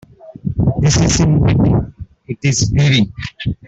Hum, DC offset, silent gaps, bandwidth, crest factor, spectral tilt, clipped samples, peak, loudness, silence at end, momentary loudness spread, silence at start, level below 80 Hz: none; under 0.1%; none; 8 kHz; 12 dB; -5 dB/octave; under 0.1%; -2 dBFS; -14 LUFS; 0.15 s; 11 LU; 0.25 s; -30 dBFS